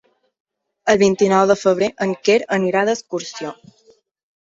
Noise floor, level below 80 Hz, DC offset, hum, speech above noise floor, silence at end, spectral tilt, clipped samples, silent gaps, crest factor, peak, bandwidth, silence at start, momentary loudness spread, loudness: -55 dBFS; -58 dBFS; under 0.1%; none; 38 dB; 0.9 s; -5 dB/octave; under 0.1%; none; 18 dB; -2 dBFS; 7.8 kHz; 0.85 s; 13 LU; -17 LUFS